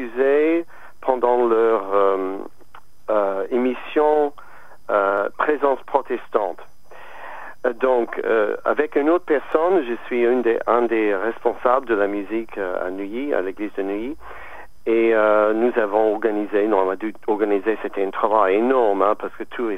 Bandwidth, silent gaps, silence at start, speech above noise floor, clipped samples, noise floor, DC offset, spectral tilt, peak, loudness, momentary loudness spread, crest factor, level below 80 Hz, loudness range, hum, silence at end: 6.4 kHz; none; 0 s; 30 dB; under 0.1%; -49 dBFS; 2%; -6.5 dB/octave; -2 dBFS; -20 LUFS; 11 LU; 18 dB; -58 dBFS; 4 LU; none; 0 s